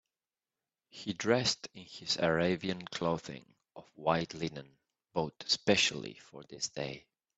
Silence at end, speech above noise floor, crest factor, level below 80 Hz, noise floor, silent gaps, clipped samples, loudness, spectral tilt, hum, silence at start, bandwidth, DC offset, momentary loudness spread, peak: 0.4 s; over 56 dB; 24 dB; -68 dBFS; under -90 dBFS; none; under 0.1%; -33 LUFS; -3.5 dB/octave; none; 0.95 s; 8.2 kHz; under 0.1%; 20 LU; -12 dBFS